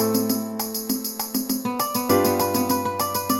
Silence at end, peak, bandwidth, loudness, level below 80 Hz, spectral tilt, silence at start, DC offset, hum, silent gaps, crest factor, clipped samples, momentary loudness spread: 0 s; -6 dBFS; 17 kHz; -23 LUFS; -60 dBFS; -3.5 dB/octave; 0 s; under 0.1%; none; none; 16 dB; under 0.1%; 6 LU